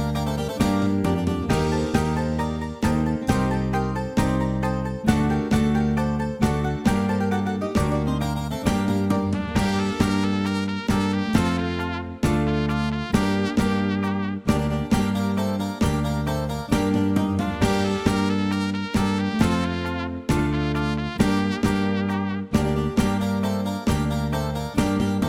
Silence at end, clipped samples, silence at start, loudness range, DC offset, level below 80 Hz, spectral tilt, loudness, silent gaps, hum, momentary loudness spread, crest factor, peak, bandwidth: 0 s; under 0.1%; 0 s; 1 LU; under 0.1%; -36 dBFS; -6.5 dB/octave; -23 LUFS; none; none; 4 LU; 18 dB; -4 dBFS; 16 kHz